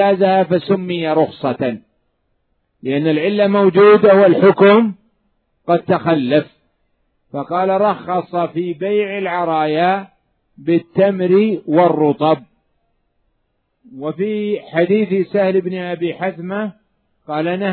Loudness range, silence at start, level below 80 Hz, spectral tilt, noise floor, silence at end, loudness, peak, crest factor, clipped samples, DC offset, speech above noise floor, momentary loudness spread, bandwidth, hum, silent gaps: 7 LU; 0 s; -64 dBFS; -11 dB/octave; -67 dBFS; 0 s; -15 LUFS; 0 dBFS; 16 dB; under 0.1%; under 0.1%; 53 dB; 13 LU; 4.5 kHz; none; none